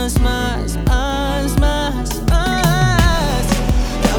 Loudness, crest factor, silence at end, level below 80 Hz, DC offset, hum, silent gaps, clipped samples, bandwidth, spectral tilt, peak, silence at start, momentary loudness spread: -17 LUFS; 14 dB; 0 s; -18 dBFS; under 0.1%; none; none; under 0.1%; 19.5 kHz; -5 dB/octave; 0 dBFS; 0 s; 6 LU